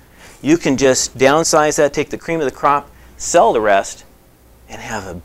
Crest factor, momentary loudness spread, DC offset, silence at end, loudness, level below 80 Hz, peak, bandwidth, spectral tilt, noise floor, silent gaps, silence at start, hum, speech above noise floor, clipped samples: 16 dB; 14 LU; under 0.1%; 0.05 s; -15 LUFS; -44 dBFS; 0 dBFS; 16 kHz; -3.5 dB/octave; -47 dBFS; none; 0.45 s; none; 32 dB; under 0.1%